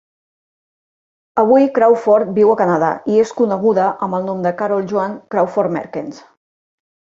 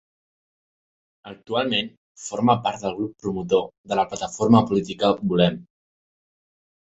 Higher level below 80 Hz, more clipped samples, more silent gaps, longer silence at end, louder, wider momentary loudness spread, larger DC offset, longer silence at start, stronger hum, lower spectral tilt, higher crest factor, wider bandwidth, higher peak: second, -62 dBFS vs -56 dBFS; neither; second, none vs 1.97-2.15 s, 3.78-3.84 s; second, 0.85 s vs 1.2 s; first, -15 LUFS vs -22 LUFS; second, 9 LU vs 16 LU; neither; about the same, 1.35 s vs 1.25 s; neither; first, -7.5 dB/octave vs -5.5 dB/octave; second, 14 dB vs 22 dB; about the same, 7.6 kHz vs 8 kHz; about the same, -2 dBFS vs -2 dBFS